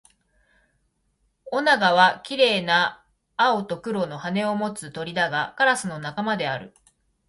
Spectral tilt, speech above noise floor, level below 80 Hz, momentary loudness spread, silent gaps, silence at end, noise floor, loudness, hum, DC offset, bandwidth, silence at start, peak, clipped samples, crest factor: -4 dB/octave; 47 dB; -66 dBFS; 12 LU; none; 0.6 s; -70 dBFS; -22 LUFS; none; under 0.1%; 11.5 kHz; 1.45 s; -4 dBFS; under 0.1%; 20 dB